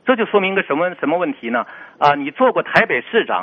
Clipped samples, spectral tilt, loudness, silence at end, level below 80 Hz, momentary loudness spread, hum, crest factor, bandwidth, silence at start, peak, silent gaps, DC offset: under 0.1%; -2.5 dB/octave; -17 LUFS; 0 s; -60 dBFS; 7 LU; none; 18 dB; 7.4 kHz; 0.05 s; 0 dBFS; none; under 0.1%